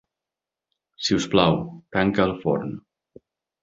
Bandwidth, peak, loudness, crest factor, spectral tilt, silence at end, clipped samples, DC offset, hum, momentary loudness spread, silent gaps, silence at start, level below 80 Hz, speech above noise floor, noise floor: 7.8 kHz; -2 dBFS; -23 LUFS; 22 dB; -5.5 dB/octave; 0.85 s; under 0.1%; under 0.1%; none; 9 LU; none; 1 s; -52 dBFS; 66 dB; -88 dBFS